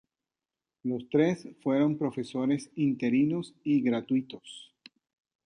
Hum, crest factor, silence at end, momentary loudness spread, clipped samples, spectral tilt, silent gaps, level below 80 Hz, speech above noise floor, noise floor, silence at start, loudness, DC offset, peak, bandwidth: none; 18 dB; 0.85 s; 12 LU; under 0.1%; -7 dB/octave; none; -74 dBFS; over 62 dB; under -90 dBFS; 0.85 s; -29 LUFS; under 0.1%; -12 dBFS; 10 kHz